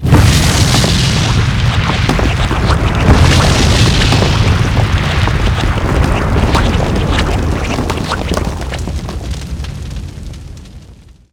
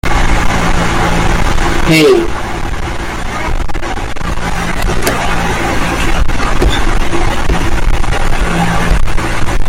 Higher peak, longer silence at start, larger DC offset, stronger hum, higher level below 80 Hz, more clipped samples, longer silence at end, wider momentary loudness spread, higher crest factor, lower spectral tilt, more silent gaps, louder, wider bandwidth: about the same, 0 dBFS vs 0 dBFS; about the same, 0 s vs 0.05 s; neither; neither; about the same, -18 dBFS vs -14 dBFS; first, 0.1% vs under 0.1%; first, 0.4 s vs 0 s; first, 14 LU vs 8 LU; about the same, 12 dB vs 10 dB; about the same, -5 dB/octave vs -5 dB/octave; neither; about the same, -12 LUFS vs -14 LUFS; first, 17.5 kHz vs 15.5 kHz